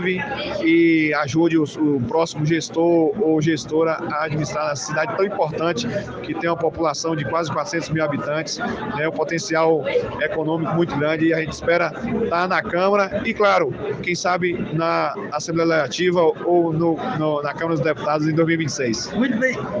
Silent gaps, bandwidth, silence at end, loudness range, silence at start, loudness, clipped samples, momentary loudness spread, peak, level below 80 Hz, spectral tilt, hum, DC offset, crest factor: none; 8 kHz; 0 s; 3 LU; 0 s; -20 LUFS; under 0.1%; 6 LU; -6 dBFS; -52 dBFS; -5.5 dB/octave; none; under 0.1%; 14 dB